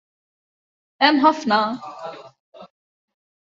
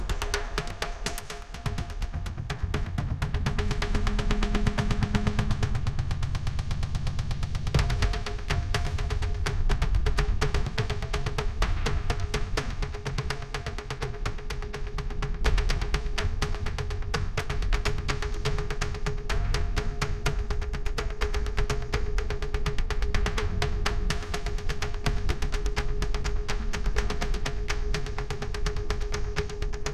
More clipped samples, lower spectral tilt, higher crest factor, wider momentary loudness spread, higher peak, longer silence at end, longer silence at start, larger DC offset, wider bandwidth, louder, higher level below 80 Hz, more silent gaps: neither; about the same, -4 dB/octave vs -5 dB/octave; about the same, 22 dB vs 18 dB; first, 20 LU vs 6 LU; first, -2 dBFS vs -8 dBFS; first, 0.85 s vs 0 s; first, 1 s vs 0 s; second, under 0.1% vs 0.3%; second, 7.6 kHz vs 14 kHz; first, -18 LUFS vs -31 LUFS; second, -70 dBFS vs -30 dBFS; first, 2.40-2.52 s vs none